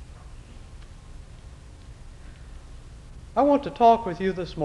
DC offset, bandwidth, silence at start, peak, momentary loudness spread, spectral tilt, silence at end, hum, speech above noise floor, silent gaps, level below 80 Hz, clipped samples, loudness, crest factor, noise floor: under 0.1%; 11 kHz; 0 s; -8 dBFS; 28 LU; -7 dB/octave; 0 s; none; 23 dB; none; -44 dBFS; under 0.1%; -22 LUFS; 20 dB; -44 dBFS